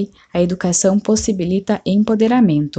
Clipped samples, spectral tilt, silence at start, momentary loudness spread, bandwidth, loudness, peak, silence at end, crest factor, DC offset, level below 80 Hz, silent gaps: under 0.1%; -5.5 dB/octave; 0 s; 6 LU; 9.2 kHz; -16 LUFS; -4 dBFS; 0.1 s; 12 dB; under 0.1%; -44 dBFS; none